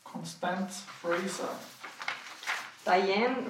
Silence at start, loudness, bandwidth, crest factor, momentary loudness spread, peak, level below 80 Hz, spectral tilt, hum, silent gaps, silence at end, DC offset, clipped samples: 0.05 s; -33 LUFS; 16.5 kHz; 20 dB; 12 LU; -12 dBFS; under -90 dBFS; -4 dB/octave; none; none; 0 s; under 0.1%; under 0.1%